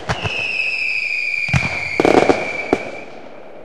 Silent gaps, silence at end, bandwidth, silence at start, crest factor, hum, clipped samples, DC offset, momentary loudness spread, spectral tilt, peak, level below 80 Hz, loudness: none; 0 s; 13.5 kHz; 0 s; 20 dB; none; under 0.1%; 2%; 19 LU; -5 dB/octave; 0 dBFS; -42 dBFS; -17 LUFS